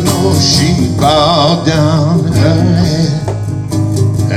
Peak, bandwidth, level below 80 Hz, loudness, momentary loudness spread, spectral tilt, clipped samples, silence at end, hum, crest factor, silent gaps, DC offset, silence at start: 0 dBFS; 15 kHz; -30 dBFS; -11 LUFS; 7 LU; -5.5 dB/octave; under 0.1%; 0 s; none; 10 dB; none; under 0.1%; 0 s